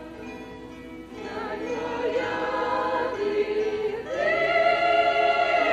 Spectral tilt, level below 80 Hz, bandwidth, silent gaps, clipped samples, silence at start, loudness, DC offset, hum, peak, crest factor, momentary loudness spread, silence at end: -4.5 dB/octave; -54 dBFS; 9.6 kHz; none; under 0.1%; 0 s; -24 LUFS; under 0.1%; none; -10 dBFS; 16 dB; 19 LU; 0 s